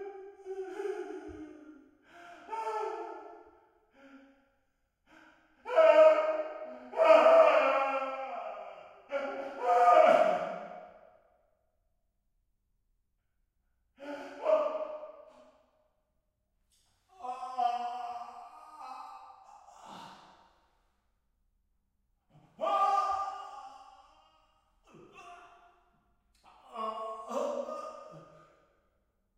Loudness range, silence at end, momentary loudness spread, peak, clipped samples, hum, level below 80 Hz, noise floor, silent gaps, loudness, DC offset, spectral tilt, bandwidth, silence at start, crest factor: 19 LU; 1.15 s; 27 LU; -10 dBFS; under 0.1%; none; -76 dBFS; -79 dBFS; none; -28 LUFS; under 0.1%; -4 dB/octave; 9.4 kHz; 0 s; 24 dB